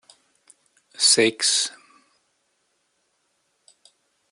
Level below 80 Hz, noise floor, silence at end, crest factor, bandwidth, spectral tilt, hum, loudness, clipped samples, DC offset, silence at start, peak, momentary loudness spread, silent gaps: -78 dBFS; -71 dBFS; 2.6 s; 24 dB; 11.5 kHz; -0.5 dB/octave; none; -18 LUFS; under 0.1%; under 0.1%; 1 s; -4 dBFS; 7 LU; none